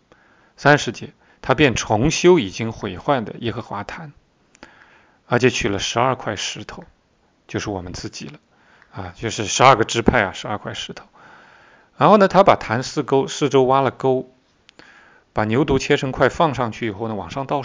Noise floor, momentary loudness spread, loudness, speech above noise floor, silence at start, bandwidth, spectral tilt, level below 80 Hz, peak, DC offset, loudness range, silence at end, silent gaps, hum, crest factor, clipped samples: -61 dBFS; 18 LU; -19 LUFS; 42 dB; 0.6 s; 7.6 kHz; -5 dB/octave; -44 dBFS; 0 dBFS; under 0.1%; 7 LU; 0 s; none; none; 20 dB; under 0.1%